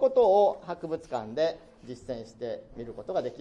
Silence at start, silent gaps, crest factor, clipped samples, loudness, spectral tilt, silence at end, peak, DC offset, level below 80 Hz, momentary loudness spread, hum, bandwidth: 0 s; none; 16 dB; under 0.1%; -29 LUFS; -6 dB/octave; 0 s; -12 dBFS; under 0.1%; -60 dBFS; 20 LU; none; 9 kHz